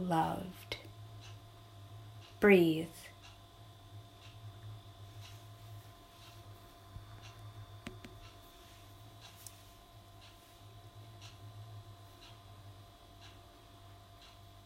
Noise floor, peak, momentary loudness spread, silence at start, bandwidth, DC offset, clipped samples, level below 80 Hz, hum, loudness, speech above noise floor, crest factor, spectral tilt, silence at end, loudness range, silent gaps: -57 dBFS; -14 dBFS; 22 LU; 0 s; 16 kHz; under 0.1%; under 0.1%; -64 dBFS; none; -33 LUFS; 27 dB; 26 dB; -6 dB/octave; 0.05 s; 20 LU; none